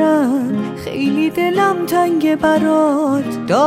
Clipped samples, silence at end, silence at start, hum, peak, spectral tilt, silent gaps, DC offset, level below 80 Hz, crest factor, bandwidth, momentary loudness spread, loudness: under 0.1%; 0 s; 0 s; none; -2 dBFS; -6 dB/octave; none; under 0.1%; -52 dBFS; 12 dB; 16 kHz; 6 LU; -16 LUFS